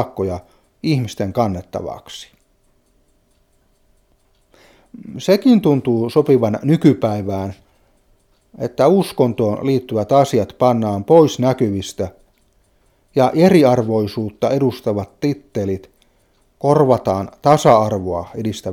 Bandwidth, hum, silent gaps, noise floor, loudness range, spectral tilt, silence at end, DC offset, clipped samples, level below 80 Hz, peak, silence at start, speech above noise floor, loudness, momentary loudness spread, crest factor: 16.5 kHz; none; none; -59 dBFS; 9 LU; -7 dB/octave; 0 s; under 0.1%; under 0.1%; -52 dBFS; 0 dBFS; 0 s; 43 dB; -17 LUFS; 14 LU; 18 dB